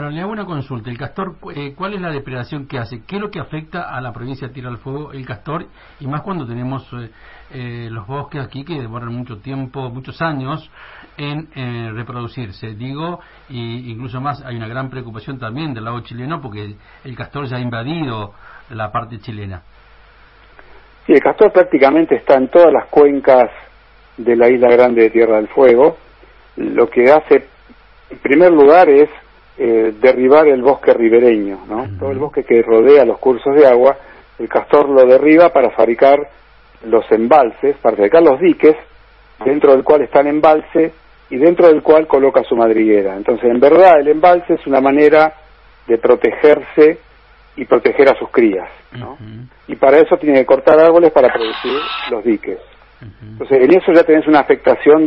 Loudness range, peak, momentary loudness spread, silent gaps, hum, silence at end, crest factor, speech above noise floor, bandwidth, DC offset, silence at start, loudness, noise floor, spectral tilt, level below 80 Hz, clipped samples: 16 LU; 0 dBFS; 19 LU; none; none; 0 s; 12 dB; 33 dB; 5.6 kHz; under 0.1%; 0 s; -11 LUFS; -45 dBFS; -9 dB/octave; -48 dBFS; 0.1%